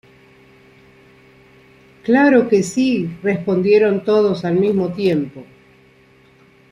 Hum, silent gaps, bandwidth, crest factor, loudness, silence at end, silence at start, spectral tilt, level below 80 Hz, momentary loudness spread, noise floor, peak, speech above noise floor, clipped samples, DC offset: none; none; 11.5 kHz; 16 dB; -16 LUFS; 1.3 s; 2.05 s; -6.5 dB/octave; -58 dBFS; 8 LU; -50 dBFS; -2 dBFS; 35 dB; under 0.1%; under 0.1%